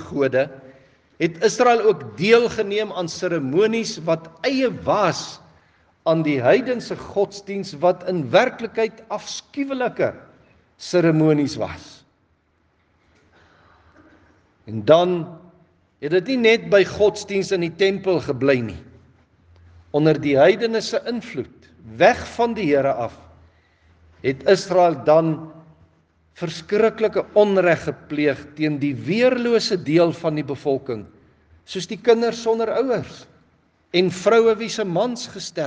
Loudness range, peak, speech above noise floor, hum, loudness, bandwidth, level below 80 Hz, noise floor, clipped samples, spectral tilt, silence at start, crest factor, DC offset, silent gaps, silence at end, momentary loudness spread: 4 LU; 0 dBFS; 44 dB; none; -20 LUFS; 9.4 kHz; -60 dBFS; -64 dBFS; under 0.1%; -5.5 dB/octave; 0 s; 20 dB; under 0.1%; none; 0 s; 13 LU